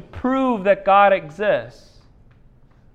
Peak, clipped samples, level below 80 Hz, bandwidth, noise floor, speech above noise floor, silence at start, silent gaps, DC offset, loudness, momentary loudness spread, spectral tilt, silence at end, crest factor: -2 dBFS; under 0.1%; -48 dBFS; 7.6 kHz; -50 dBFS; 32 dB; 0.15 s; none; under 0.1%; -18 LUFS; 8 LU; -7 dB/octave; 1.25 s; 18 dB